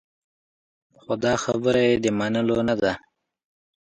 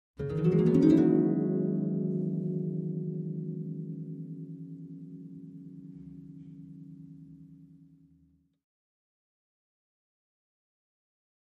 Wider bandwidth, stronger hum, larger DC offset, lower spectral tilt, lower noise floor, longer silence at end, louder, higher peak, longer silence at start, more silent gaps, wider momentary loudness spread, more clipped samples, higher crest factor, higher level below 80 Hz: first, 9.4 kHz vs 6.6 kHz; neither; neither; second, -5 dB/octave vs -10.5 dB/octave; first, under -90 dBFS vs -66 dBFS; second, 0.85 s vs 3.95 s; first, -23 LUFS vs -29 LUFS; about the same, -8 dBFS vs -10 dBFS; first, 1.1 s vs 0.2 s; neither; second, 6 LU vs 25 LU; neither; about the same, 18 dB vs 22 dB; first, -54 dBFS vs -64 dBFS